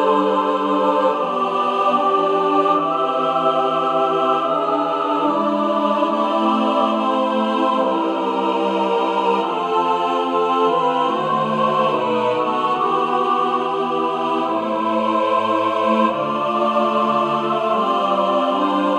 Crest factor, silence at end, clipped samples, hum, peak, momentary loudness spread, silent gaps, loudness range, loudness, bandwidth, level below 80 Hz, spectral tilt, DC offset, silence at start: 14 dB; 0 s; under 0.1%; none; -4 dBFS; 3 LU; none; 1 LU; -18 LUFS; 11 kHz; -72 dBFS; -6 dB/octave; under 0.1%; 0 s